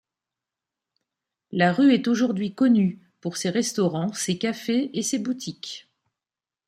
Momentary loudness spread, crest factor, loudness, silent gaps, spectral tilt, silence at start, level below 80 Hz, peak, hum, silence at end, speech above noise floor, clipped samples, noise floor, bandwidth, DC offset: 14 LU; 18 dB; -23 LUFS; none; -5 dB/octave; 1.5 s; -70 dBFS; -6 dBFS; none; 0.9 s; over 67 dB; under 0.1%; under -90 dBFS; 15 kHz; under 0.1%